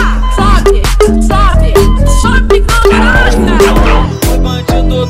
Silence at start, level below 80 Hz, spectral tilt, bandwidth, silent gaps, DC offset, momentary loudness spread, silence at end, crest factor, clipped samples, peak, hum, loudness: 0 s; -10 dBFS; -5.5 dB/octave; 16 kHz; none; under 0.1%; 5 LU; 0 s; 6 dB; 0.5%; 0 dBFS; none; -9 LUFS